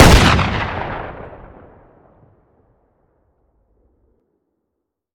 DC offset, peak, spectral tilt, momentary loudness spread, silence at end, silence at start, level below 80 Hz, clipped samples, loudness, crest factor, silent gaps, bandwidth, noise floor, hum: under 0.1%; 0 dBFS; -4.5 dB/octave; 26 LU; 3.8 s; 0 s; -24 dBFS; under 0.1%; -15 LUFS; 18 dB; none; 19 kHz; -77 dBFS; none